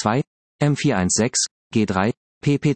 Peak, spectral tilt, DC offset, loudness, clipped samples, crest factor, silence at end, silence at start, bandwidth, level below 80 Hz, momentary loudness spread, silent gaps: -4 dBFS; -4.5 dB/octave; under 0.1%; -21 LUFS; under 0.1%; 18 dB; 0 s; 0 s; 8.8 kHz; -56 dBFS; 6 LU; 0.27-0.59 s, 1.51-1.70 s, 2.17-2.41 s